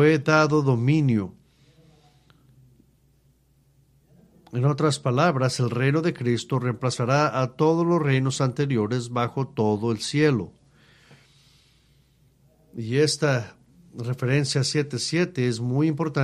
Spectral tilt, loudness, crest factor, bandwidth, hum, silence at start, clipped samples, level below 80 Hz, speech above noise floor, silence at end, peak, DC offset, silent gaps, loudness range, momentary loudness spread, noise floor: -6 dB/octave; -23 LUFS; 20 dB; 12 kHz; none; 0 s; under 0.1%; -62 dBFS; 39 dB; 0 s; -4 dBFS; under 0.1%; none; 6 LU; 7 LU; -61 dBFS